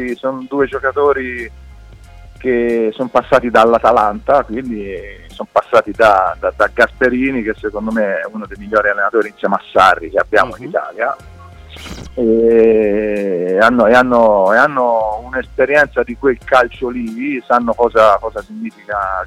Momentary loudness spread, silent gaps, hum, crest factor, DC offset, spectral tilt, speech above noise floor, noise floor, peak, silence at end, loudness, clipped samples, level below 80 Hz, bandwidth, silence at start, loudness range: 14 LU; none; none; 14 dB; under 0.1%; -6 dB/octave; 23 dB; -37 dBFS; 0 dBFS; 0 s; -14 LUFS; under 0.1%; -38 dBFS; 14 kHz; 0 s; 4 LU